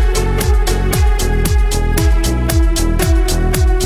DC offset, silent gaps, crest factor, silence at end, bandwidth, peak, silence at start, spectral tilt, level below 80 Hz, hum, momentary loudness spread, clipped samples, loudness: under 0.1%; none; 12 dB; 0 s; over 20 kHz; 0 dBFS; 0 s; -5 dB/octave; -14 dBFS; none; 1 LU; under 0.1%; -15 LUFS